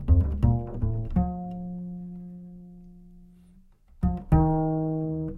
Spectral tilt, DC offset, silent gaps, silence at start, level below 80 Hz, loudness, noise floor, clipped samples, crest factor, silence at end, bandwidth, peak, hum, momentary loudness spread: -12 dB/octave; under 0.1%; none; 0 s; -32 dBFS; -27 LUFS; -55 dBFS; under 0.1%; 20 dB; 0 s; 3.1 kHz; -6 dBFS; none; 20 LU